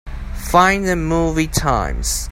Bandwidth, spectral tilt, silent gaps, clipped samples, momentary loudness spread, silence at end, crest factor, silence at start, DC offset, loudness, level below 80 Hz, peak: 16.5 kHz; -4.5 dB/octave; none; under 0.1%; 9 LU; 0 s; 18 dB; 0.05 s; under 0.1%; -17 LUFS; -26 dBFS; 0 dBFS